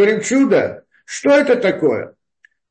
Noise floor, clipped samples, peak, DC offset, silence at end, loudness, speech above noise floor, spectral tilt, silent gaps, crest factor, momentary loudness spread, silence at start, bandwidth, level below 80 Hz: -57 dBFS; under 0.1%; -4 dBFS; under 0.1%; 0.65 s; -16 LUFS; 42 dB; -4.5 dB/octave; none; 12 dB; 13 LU; 0 s; 8.8 kHz; -64 dBFS